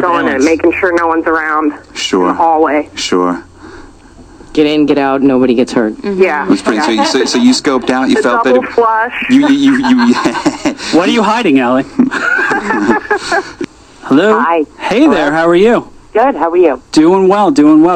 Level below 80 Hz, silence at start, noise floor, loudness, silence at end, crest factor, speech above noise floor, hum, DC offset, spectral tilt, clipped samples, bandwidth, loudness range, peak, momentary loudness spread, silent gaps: -44 dBFS; 0 s; -36 dBFS; -10 LUFS; 0 s; 10 dB; 27 dB; none; under 0.1%; -4.5 dB/octave; 0.3%; 9.4 kHz; 3 LU; 0 dBFS; 6 LU; none